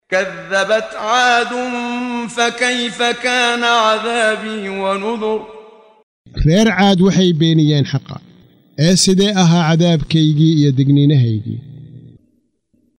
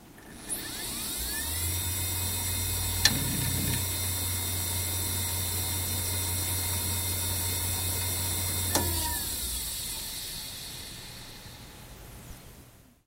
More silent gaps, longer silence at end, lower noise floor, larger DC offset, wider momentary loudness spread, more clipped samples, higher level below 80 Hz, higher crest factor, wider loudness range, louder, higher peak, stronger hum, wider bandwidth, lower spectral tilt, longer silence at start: first, 6.03-6.25 s vs none; first, 0.9 s vs 0.25 s; first, -61 dBFS vs -54 dBFS; neither; second, 10 LU vs 18 LU; neither; first, -38 dBFS vs -46 dBFS; second, 14 dB vs 28 dB; about the same, 4 LU vs 6 LU; first, -14 LUFS vs -29 LUFS; about the same, -2 dBFS vs -4 dBFS; neither; about the same, 15.5 kHz vs 16 kHz; first, -5 dB/octave vs -2.5 dB/octave; about the same, 0.1 s vs 0 s